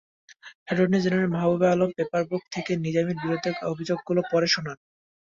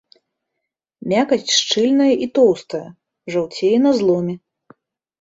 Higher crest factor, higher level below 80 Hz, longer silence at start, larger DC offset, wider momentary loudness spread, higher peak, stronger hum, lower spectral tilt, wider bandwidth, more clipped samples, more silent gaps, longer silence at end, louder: about the same, 16 dB vs 16 dB; about the same, -64 dBFS vs -62 dBFS; second, 0.3 s vs 1.05 s; neither; second, 8 LU vs 14 LU; second, -10 dBFS vs -2 dBFS; neither; first, -6 dB/octave vs -4 dB/octave; about the same, 7.6 kHz vs 8 kHz; neither; first, 0.55-0.66 s vs none; second, 0.55 s vs 0.85 s; second, -25 LUFS vs -17 LUFS